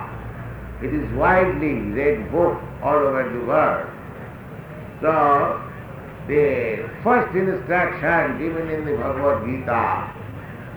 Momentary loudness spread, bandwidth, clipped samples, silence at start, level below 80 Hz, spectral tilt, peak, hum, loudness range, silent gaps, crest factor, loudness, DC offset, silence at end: 17 LU; over 20 kHz; under 0.1%; 0 s; -42 dBFS; -9 dB/octave; -4 dBFS; none; 2 LU; none; 16 dB; -21 LUFS; under 0.1%; 0 s